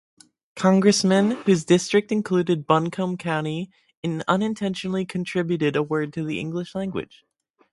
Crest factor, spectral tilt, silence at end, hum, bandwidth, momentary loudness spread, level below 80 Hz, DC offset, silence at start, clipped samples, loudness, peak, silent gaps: 22 dB; -5.5 dB/octave; 0.7 s; none; 11.5 kHz; 12 LU; -62 dBFS; under 0.1%; 0.55 s; under 0.1%; -23 LUFS; -2 dBFS; 3.97-4.03 s